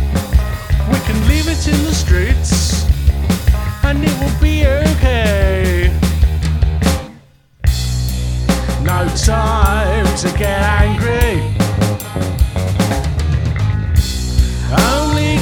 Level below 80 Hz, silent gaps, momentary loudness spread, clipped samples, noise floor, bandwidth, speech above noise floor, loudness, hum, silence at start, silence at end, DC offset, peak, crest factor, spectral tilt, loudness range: -16 dBFS; none; 4 LU; under 0.1%; -44 dBFS; 18.5 kHz; 31 dB; -15 LUFS; none; 0 s; 0 s; under 0.1%; 0 dBFS; 12 dB; -5.5 dB/octave; 2 LU